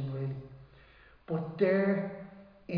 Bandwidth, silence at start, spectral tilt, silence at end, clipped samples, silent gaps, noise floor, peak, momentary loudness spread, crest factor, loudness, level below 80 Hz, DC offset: 5.2 kHz; 0 s; -10.5 dB/octave; 0 s; under 0.1%; none; -58 dBFS; -16 dBFS; 23 LU; 18 dB; -32 LUFS; -64 dBFS; under 0.1%